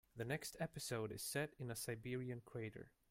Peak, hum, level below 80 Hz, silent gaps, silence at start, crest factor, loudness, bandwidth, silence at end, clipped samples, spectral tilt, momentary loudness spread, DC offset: -28 dBFS; none; -72 dBFS; none; 0.15 s; 20 dB; -47 LUFS; 16.5 kHz; 0.2 s; under 0.1%; -4.5 dB/octave; 6 LU; under 0.1%